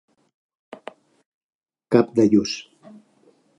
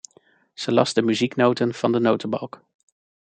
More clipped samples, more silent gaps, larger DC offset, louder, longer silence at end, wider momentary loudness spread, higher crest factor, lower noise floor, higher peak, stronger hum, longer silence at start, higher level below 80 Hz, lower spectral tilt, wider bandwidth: neither; neither; neither; about the same, -20 LUFS vs -22 LUFS; first, 1 s vs 0.85 s; first, 24 LU vs 10 LU; about the same, 24 dB vs 20 dB; about the same, -59 dBFS vs -58 dBFS; about the same, -2 dBFS vs -4 dBFS; neither; first, 1.9 s vs 0.6 s; first, -62 dBFS vs -68 dBFS; about the same, -6 dB/octave vs -5.5 dB/octave; first, 11 kHz vs 9.2 kHz